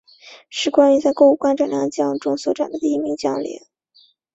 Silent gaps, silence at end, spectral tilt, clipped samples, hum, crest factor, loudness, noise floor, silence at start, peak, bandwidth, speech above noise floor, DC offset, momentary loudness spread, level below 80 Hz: none; 0.75 s; -4.5 dB/octave; under 0.1%; none; 18 dB; -18 LUFS; -56 dBFS; 0.25 s; -2 dBFS; 8 kHz; 38 dB; under 0.1%; 11 LU; -64 dBFS